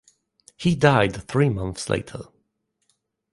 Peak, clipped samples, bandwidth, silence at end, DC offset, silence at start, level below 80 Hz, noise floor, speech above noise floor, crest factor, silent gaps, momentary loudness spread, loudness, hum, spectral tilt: -2 dBFS; under 0.1%; 11.5 kHz; 1.1 s; under 0.1%; 0.6 s; -48 dBFS; -74 dBFS; 52 dB; 22 dB; none; 13 LU; -22 LUFS; none; -6 dB/octave